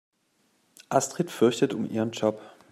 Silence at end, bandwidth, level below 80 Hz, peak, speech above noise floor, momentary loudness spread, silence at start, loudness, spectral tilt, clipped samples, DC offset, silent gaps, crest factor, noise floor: 0.2 s; 15.5 kHz; -74 dBFS; -8 dBFS; 44 dB; 6 LU; 0.9 s; -26 LUFS; -5 dB/octave; under 0.1%; under 0.1%; none; 20 dB; -70 dBFS